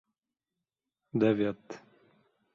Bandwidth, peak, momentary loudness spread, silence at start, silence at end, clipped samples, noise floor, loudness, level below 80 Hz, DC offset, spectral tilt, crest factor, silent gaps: 7.2 kHz; -14 dBFS; 21 LU; 1.15 s; 0.75 s; under 0.1%; -90 dBFS; -30 LUFS; -72 dBFS; under 0.1%; -8 dB/octave; 20 dB; none